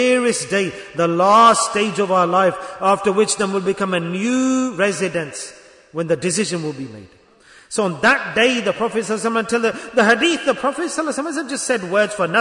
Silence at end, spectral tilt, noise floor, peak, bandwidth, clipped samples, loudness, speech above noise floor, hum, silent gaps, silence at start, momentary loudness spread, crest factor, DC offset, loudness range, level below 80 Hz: 0 s; -3.5 dB/octave; -48 dBFS; -2 dBFS; 11 kHz; under 0.1%; -18 LUFS; 30 dB; none; none; 0 s; 10 LU; 16 dB; under 0.1%; 6 LU; -60 dBFS